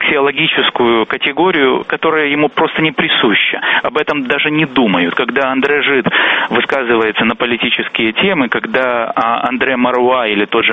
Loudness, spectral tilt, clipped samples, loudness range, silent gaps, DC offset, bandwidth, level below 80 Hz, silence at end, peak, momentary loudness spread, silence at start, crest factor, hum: -12 LUFS; -6.5 dB/octave; under 0.1%; 1 LU; none; under 0.1%; 7 kHz; -52 dBFS; 0 s; 0 dBFS; 3 LU; 0 s; 14 dB; none